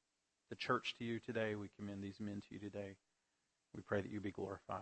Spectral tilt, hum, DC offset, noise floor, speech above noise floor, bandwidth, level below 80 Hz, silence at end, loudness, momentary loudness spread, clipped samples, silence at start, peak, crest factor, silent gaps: -6 dB/octave; none; under 0.1%; -86 dBFS; 42 dB; 8.4 kHz; -78 dBFS; 0 s; -45 LUFS; 12 LU; under 0.1%; 0.5 s; -24 dBFS; 22 dB; none